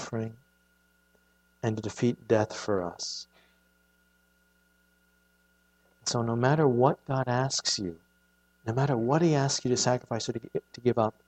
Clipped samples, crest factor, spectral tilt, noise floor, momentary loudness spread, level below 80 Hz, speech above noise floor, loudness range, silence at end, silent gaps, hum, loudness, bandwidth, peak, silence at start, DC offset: under 0.1%; 22 dB; -5 dB/octave; -68 dBFS; 12 LU; -66 dBFS; 40 dB; 11 LU; 0.2 s; none; none; -28 LUFS; 9 kHz; -8 dBFS; 0 s; under 0.1%